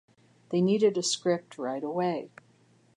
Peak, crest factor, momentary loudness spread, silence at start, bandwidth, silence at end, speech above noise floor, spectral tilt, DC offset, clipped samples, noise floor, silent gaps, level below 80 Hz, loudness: -12 dBFS; 18 dB; 11 LU; 0.5 s; 11.5 kHz; 0.7 s; 35 dB; -4.5 dB/octave; under 0.1%; under 0.1%; -63 dBFS; none; -80 dBFS; -28 LUFS